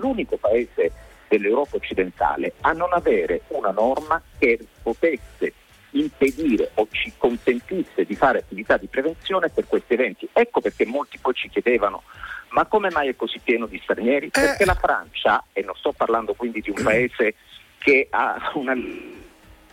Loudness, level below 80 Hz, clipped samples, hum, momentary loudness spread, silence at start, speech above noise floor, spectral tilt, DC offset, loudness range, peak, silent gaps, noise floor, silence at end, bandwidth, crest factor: -22 LUFS; -44 dBFS; under 0.1%; none; 7 LU; 0 s; 27 dB; -5 dB/octave; under 0.1%; 2 LU; -6 dBFS; none; -48 dBFS; 0.45 s; 16.5 kHz; 18 dB